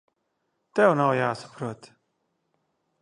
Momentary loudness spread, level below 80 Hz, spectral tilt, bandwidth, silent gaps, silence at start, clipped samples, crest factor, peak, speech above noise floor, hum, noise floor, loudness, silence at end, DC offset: 16 LU; -74 dBFS; -6.5 dB/octave; 10.5 kHz; none; 0.75 s; under 0.1%; 24 dB; -4 dBFS; 53 dB; none; -76 dBFS; -23 LUFS; 1.25 s; under 0.1%